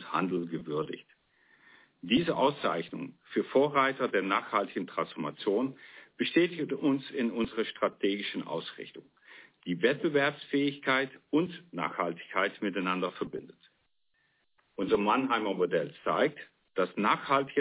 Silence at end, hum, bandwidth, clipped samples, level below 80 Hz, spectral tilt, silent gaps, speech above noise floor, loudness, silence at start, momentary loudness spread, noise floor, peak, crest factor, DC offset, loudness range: 0 s; none; 4 kHz; under 0.1%; -70 dBFS; -3.5 dB/octave; none; 44 dB; -30 LUFS; 0 s; 12 LU; -74 dBFS; -12 dBFS; 18 dB; under 0.1%; 4 LU